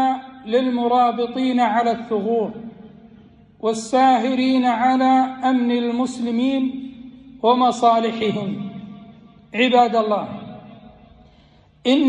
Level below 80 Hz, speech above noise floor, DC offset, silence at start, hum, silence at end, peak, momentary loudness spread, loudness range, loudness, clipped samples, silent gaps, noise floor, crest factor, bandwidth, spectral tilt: -60 dBFS; 34 dB; under 0.1%; 0 s; none; 0 s; -4 dBFS; 17 LU; 4 LU; -19 LUFS; under 0.1%; none; -52 dBFS; 16 dB; 10.5 kHz; -5 dB/octave